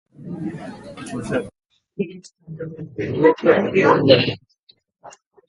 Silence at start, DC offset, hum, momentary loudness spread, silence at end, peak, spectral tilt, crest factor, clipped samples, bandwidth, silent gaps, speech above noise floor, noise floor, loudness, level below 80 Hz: 0.2 s; under 0.1%; none; 21 LU; 0.4 s; 0 dBFS; -6.5 dB/octave; 20 dB; under 0.1%; 11.5 kHz; 4.58-4.67 s; 39 dB; -58 dBFS; -19 LUFS; -54 dBFS